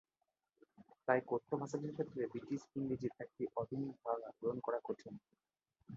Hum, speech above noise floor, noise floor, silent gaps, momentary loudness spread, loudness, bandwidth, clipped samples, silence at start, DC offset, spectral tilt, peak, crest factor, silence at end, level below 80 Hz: none; 47 dB; -88 dBFS; none; 9 LU; -42 LUFS; 7.4 kHz; under 0.1%; 0.8 s; under 0.1%; -7.5 dB/octave; -18 dBFS; 26 dB; 0 s; -78 dBFS